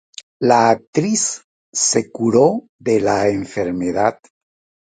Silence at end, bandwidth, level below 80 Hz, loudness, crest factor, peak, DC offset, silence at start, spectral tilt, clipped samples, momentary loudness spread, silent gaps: 0.75 s; 9.6 kHz; -54 dBFS; -17 LUFS; 18 dB; 0 dBFS; under 0.1%; 0.4 s; -4 dB/octave; under 0.1%; 9 LU; 0.87-0.93 s, 1.44-1.73 s, 2.69-2.79 s